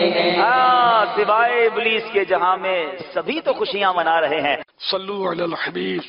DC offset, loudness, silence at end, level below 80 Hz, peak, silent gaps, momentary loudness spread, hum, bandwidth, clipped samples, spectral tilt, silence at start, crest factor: under 0.1%; -19 LUFS; 0 s; -64 dBFS; -4 dBFS; none; 9 LU; none; 5.6 kHz; under 0.1%; -1 dB/octave; 0 s; 14 dB